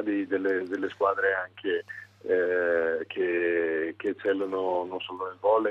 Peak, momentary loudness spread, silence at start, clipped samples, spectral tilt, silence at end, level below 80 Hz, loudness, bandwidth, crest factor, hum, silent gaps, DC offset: -12 dBFS; 7 LU; 0 s; under 0.1%; -6.5 dB/octave; 0 s; -76 dBFS; -28 LUFS; 6.6 kHz; 16 dB; none; none; under 0.1%